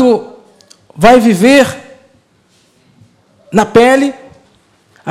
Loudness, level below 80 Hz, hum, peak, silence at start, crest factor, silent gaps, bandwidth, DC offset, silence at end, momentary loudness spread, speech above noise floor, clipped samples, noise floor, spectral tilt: -9 LUFS; -44 dBFS; none; 0 dBFS; 0 s; 12 dB; none; 16 kHz; under 0.1%; 0 s; 11 LU; 45 dB; 0.4%; -52 dBFS; -5 dB/octave